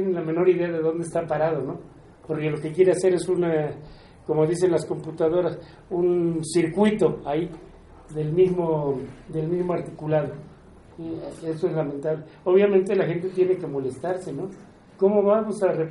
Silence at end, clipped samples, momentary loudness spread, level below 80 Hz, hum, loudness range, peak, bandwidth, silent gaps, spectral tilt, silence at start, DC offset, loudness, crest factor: 0 s; under 0.1%; 13 LU; -56 dBFS; none; 3 LU; -8 dBFS; 11.5 kHz; none; -7 dB/octave; 0 s; under 0.1%; -24 LUFS; 16 dB